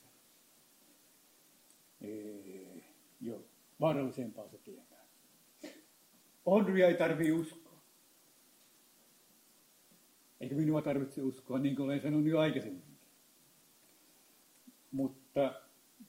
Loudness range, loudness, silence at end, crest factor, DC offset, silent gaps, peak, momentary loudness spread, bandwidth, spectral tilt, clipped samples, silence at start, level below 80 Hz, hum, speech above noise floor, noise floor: 10 LU; -34 LUFS; 0.05 s; 24 dB; under 0.1%; none; -14 dBFS; 23 LU; 16 kHz; -7 dB/octave; under 0.1%; 2 s; -78 dBFS; none; 33 dB; -66 dBFS